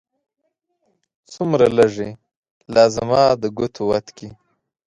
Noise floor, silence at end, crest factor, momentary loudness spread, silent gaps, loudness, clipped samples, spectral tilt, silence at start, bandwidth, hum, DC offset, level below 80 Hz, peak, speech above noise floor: -71 dBFS; 0.55 s; 20 dB; 15 LU; 2.37-2.43 s, 2.51-2.60 s; -18 LUFS; under 0.1%; -5.5 dB/octave; 1.3 s; 11.5 kHz; none; under 0.1%; -52 dBFS; 0 dBFS; 53 dB